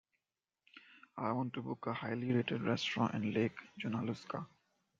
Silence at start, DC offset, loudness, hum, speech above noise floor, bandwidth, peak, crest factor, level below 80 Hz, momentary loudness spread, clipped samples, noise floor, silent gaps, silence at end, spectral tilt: 0.75 s; under 0.1%; -38 LUFS; none; over 53 dB; 7.6 kHz; -20 dBFS; 20 dB; -76 dBFS; 12 LU; under 0.1%; under -90 dBFS; none; 0.55 s; -6.5 dB/octave